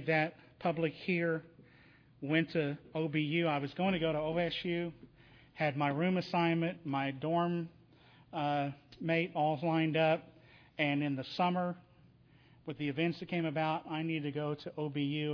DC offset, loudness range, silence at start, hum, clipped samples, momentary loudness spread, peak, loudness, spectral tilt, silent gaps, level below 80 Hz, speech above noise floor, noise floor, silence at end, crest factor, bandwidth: under 0.1%; 3 LU; 0 s; none; under 0.1%; 8 LU; -16 dBFS; -34 LUFS; -8 dB/octave; none; -70 dBFS; 29 dB; -63 dBFS; 0 s; 20 dB; 5.4 kHz